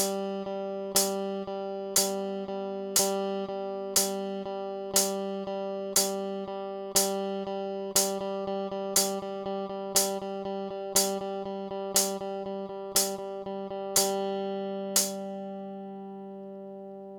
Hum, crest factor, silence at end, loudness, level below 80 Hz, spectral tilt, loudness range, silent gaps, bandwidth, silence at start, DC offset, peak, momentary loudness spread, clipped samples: 50 Hz at -70 dBFS; 22 dB; 0 s; -29 LUFS; -68 dBFS; -2.5 dB/octave; 1 LU; none; over 20 kHz; 0 s; under 0.1%; -8 dBFS; 11 LU; under 0.1%